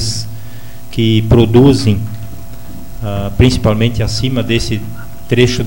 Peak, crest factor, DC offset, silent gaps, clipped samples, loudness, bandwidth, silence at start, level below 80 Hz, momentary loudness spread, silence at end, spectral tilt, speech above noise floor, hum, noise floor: 0 dBFS; 14 dB; 7%; none; under 0.1%; -13 LUFS; 17 kHz; 0 s; -28 dBFS; 23 LU; 0 s; -6 dB/octave; 21 dB; none; -32 dBFS